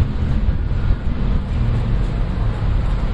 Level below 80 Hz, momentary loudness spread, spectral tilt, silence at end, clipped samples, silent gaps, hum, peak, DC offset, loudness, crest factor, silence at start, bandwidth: -20 dBFS; 2 LU; -8.5 dB/octave; 0 s; under 0.1%; none; none; -4 dBFS; under 0.1%; -21 LUFS; 14 dB; 0 s; 5.4 kHz